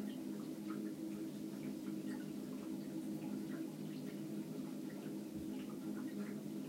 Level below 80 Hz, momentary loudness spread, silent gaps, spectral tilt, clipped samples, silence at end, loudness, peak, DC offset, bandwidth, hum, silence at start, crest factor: -78 dBFS; 2 LU; none; -6.5 dB/octave; under 0.1%; 0 s; -46 LUFS; -32 dBFS; under 0.1%; 16 kHz; none; 0 s; 12 dB